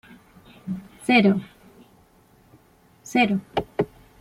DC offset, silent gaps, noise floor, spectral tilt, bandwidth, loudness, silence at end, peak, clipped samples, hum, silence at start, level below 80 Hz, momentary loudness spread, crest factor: under 0.1%; none; -56 dBFS; -6 dB/octave; 13.5 kHz; -23 LUFS; 0.35 s; -6 dBFS; under 0.1%; none; 0.65 s; -58 dBFS; 17 LU; 20 dB